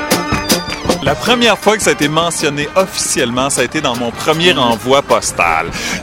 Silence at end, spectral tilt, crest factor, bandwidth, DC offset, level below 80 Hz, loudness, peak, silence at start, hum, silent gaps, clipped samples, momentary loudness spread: 0 s; -3 dB/octave; 14 dB; 17 kHz; under 0.1%; -36 dBFS; -13 LUFS; 0 dBFS; 0 s; none; none; under 0.1%; 5 LU